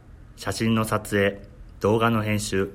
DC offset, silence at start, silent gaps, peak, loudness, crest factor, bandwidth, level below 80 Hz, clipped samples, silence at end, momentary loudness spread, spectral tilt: under 0.1%; 0.1 s; none; -8 dBFS; -24 LUFS; 16 dB; 16 kHz; -46 dBFS; under 0.1%; 0 s; 10 LU; -5.5 dB/octave